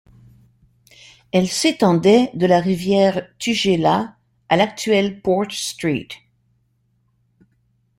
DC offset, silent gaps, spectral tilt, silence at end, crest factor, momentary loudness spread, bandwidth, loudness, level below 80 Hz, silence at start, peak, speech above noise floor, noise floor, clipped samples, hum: under 0.1%; none; -5 dB/octave; 1.85 s; 18 dB; 9 LU; 16.5 kHz; -18 LUFS; -56 dBFS; 1.35 s; -2 dBFS; 47 dB; -64 dBFS; under 0.1%; none